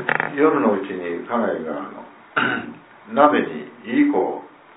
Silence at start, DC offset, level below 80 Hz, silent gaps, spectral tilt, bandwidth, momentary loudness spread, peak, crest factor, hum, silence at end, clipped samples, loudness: 0 s; under 0.1%; -66 dBFS; none; -9.5 dB/octave; 4 kHz; 16 LU; -2 dBFS; 20 dB; none; 0.3 s; under 0.1%; -21 LUFS